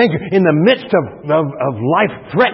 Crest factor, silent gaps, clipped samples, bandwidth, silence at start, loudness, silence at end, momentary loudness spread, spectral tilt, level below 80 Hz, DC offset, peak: 14 dB; none; under 0.1%; 5.8 kHz; 0 s; -15 LUFS; 0 s; 6 LU; -11.5 dB/octave; -52 dBFS; under 0.1%; 0 dBFS